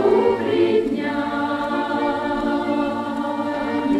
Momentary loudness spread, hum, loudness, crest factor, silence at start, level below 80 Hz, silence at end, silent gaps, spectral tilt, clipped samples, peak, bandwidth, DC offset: 6 LU; none; -21 LUFS; 16 dB; 0 s; -50 dBFS; 0 s; none; -6.5 dB/octave; under 0.1%; -6 dBFS; 11.5 kHz; under 0.1%